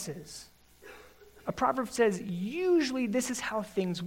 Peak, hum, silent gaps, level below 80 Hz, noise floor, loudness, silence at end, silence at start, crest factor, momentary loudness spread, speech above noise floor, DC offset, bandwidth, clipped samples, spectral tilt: -14 dBFS; 60 Hz at -60 dBFS; none; -64 dBFS; -55 dBFS; -31 LUFS; 0 s; 0 s; 18 dB; 19 LU; 24 dB; under 0.1%; 16 kHz; under 0.1%; -5 dB/octave